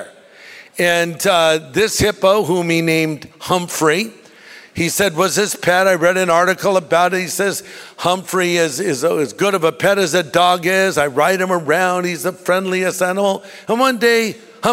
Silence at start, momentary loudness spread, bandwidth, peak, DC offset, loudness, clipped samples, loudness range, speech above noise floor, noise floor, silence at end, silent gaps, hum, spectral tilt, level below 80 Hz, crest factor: 0 s; 7 LU; 16 kHz; -2 dBFS; under 0.1%; -16 LUFS; under 0.1%; 2 LU; 25 dB; -41 dBFS; 0 s; none; none; -3.5 dB/octave; -50 dBFS; 16 dB